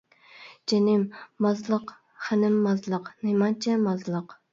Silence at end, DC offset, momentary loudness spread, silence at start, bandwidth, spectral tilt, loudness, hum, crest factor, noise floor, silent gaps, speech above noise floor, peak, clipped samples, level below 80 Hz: 0.2 s; under 0.1%; 11 LU; 0.35 s; 7.6 kHz; -6.5 dB/octave; -26 LUFS; none; 14 dB; -50 dBFS; none; 25 dB; -12 dBFS; under 0.1%; -74 dBFS